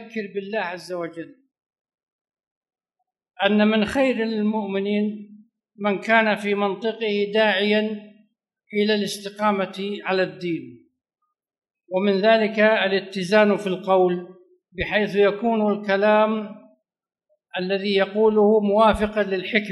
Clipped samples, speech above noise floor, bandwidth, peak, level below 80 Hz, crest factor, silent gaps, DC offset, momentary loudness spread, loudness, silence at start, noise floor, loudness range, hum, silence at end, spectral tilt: under 0.1%; 60 dB; 12 kHz; -4 dBFS; -50 dBFS; 20 dB; 1.81-1.85 s, 1.94-2.25 s, 2.47-2.61 s; under 0.1%; 12 LU; -21 LUFS; 0 s; -81 dBFS; 5 LU; none; 0 s; -6 dB/octave